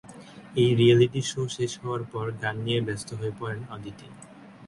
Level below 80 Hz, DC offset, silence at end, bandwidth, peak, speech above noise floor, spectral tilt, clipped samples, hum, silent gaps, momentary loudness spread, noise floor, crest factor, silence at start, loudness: -60 dBFS; under 0.1%; 0 s; 11.5 kHz; -8 dBFS; 20 dB; -6 dB/octave; under 0.1%; none; none; 23 LU; -46 dBFS; 18 dB; 0.05 s; -26 LUFS